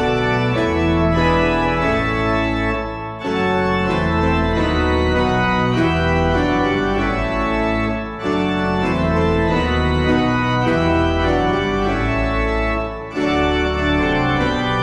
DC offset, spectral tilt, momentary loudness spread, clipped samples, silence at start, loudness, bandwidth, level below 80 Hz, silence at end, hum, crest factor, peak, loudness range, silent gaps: under 0.1%; -7 dB/octave; 4 LU; under 0.1%; 0 s; -18 LUFS; 11 kHz; -28 dBFS; 0 s; none; 14 dB; -4 dBFS; 1 LU; none